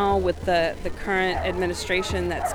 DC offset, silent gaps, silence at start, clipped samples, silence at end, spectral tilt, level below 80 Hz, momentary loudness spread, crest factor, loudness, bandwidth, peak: under 0.1%; none; 0 s; under 0.1%; 0 s; -4.5 dB/octave; -36 dBFS; 4 LU; 14 dB; -24 LUFS; 19.5 kHz; -10 dBFS